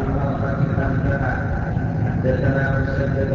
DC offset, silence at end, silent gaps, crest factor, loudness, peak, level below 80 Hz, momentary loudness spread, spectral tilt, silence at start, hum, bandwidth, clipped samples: under 0.1%; 0 s; none; 12 dB; -21 LUFS; -8 dBFS; -30 dBFS; 4 LU; -9.5 dB/octave; 0 s; none; 7 kHz; under 0.1%